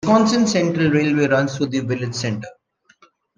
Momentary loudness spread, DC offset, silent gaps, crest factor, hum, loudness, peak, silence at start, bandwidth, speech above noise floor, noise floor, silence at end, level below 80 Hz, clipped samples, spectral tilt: 10 LU; under 0.1%; none; 18 dB; none; -19 LUFS; -2 dBFS; 0.05 s; 9.8 kHz; 37 dB; -55 dBFS; 0.85 s; -56 dBFS; under 0.1%; -5.5 dB/octave